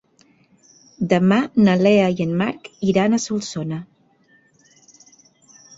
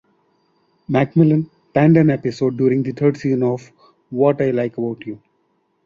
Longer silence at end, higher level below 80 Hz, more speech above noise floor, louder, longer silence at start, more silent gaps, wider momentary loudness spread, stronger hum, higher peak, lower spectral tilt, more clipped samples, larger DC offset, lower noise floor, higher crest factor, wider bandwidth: first, 1.95 s vs 0.7 s; about the same, -58 dBFS vs -56 dBFS; second, 40 dB vs 49 dB; about the same, -19 LUFS vs -18 LUFS; about the same, 1 s vs 0.9 s; neither; about the same, 12 LU vs 14 LU; neither; about the same, -2 dBFS vs -2 dBFS; second, -6 dB/octave vs -9 dB/octave; neither; neither; second, -57 dBFS vs -65 dBFS; about the same, 18 dB vs 16 dB; about the same, 7.8 kHz vs 7.4 kHz